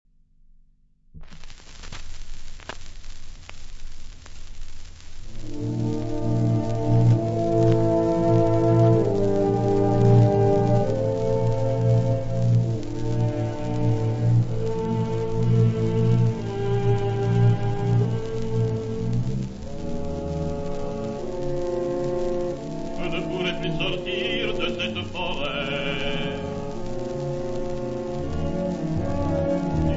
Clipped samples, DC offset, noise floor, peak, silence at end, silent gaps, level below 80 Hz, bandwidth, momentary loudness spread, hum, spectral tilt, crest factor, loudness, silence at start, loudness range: under 0.1%; under 0.1%; -57 dBFS; -6 dBFS; 0 s; none; -36 dBFS; 7.8 kHz; 20 LU; none; -7.5 dB/octave; 18 dB; -24 LUFS; 1.15 s; 19 LU